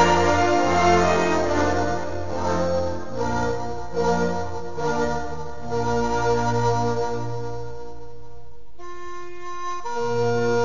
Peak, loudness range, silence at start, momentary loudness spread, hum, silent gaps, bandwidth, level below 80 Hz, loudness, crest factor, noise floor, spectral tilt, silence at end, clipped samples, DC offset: -4 dBFS; 8 LU; 0 s; 18 LU; none; none; 7.4 kHz; -40 dBFS; -23 LUFS; 18 dB; -47 dBFS; -5.5 dB/octave; 0 s; under 0.1%; 4%